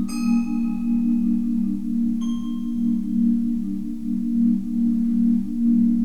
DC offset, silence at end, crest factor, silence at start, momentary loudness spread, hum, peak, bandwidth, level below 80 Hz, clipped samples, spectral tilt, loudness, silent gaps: 2%; 0 s; 10 dB; 0 s; 6 LU; none; -10 dBFS; 8.8 kHz; -46 dBFS; under 0.1%; -7.5 dB/octave; -22 LUFS; none